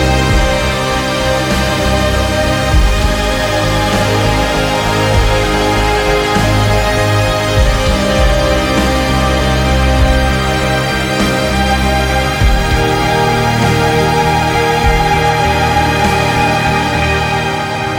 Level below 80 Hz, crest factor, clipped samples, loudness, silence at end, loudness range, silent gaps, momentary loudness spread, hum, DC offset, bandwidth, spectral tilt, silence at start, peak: -18 dBFS; 12 dB; under 0.1%; -12 LUFS; 0 s; 1 LU; none; 2 LU; none; under 0.1%; 19.5 kHz; -5 dB/octave; 0 s; 0 dBFS